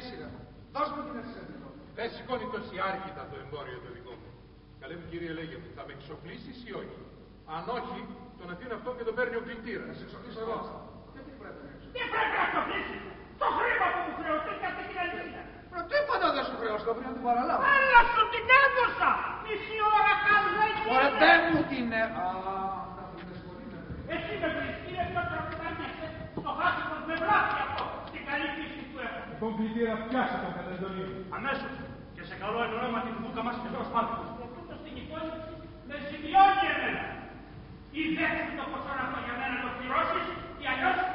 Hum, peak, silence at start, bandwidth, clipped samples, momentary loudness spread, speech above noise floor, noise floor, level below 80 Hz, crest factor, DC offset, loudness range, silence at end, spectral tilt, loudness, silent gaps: none; -6 dBFS; 0 s; 5.6 kHz; under 0.1%; 21 LU; 23 dB; -52 dBFS; -54 dBFS; 24 dB; under 0.1%; 15 LU; 0 s; -2 dB/octave; -29 LUFS; none